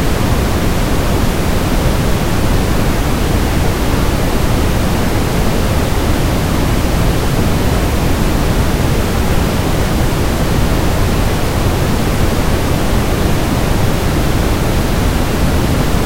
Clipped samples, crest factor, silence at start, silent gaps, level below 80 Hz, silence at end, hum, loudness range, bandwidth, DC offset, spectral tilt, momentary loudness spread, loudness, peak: under 0.1%; 12 dB; 0 s; none; -18 dBFS; 0 s; none; 0 LU; 16 kHz; under 0.1%; -5.5 dB/octave; 1 LU; -15 LUFS; 0 dBFS